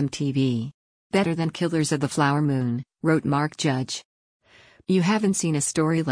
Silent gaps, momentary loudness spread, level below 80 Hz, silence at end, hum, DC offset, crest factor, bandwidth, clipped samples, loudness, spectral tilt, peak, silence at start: 0.74-1.10 s, 4.05-4.40 s; 7 LU; -62 dBFS; 0 s; none; under 0.1%; 16 dB; 10.5 kHz; under 0.1%; -24 LUFS; -5.5 dB/octave; -8 dBFS; 0 s